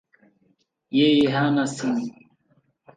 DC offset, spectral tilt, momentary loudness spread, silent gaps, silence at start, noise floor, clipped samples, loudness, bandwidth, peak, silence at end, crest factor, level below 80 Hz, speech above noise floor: under 0.1%; -5.5 dB/octave; 10 LU; none; 0.9 s; -67 dBFS; under 0.1%; -21 LUFS; 9.6 kHz; -8 dBFS; 0.85 s; 16 dB; -66 dBFS; 46 dB